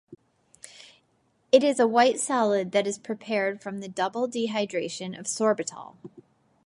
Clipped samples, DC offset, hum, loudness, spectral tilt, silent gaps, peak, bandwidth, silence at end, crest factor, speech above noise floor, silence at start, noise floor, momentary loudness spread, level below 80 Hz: under 0.1%; under 0.1%; none; -25 LUFS; -3.5 dB/octave; none; -4 dBFS; 11.5 kHz; 0.6 s; 22 dB; 43 dB; 0.1 s; -69 dBFS; 15 LU; -78 dBFS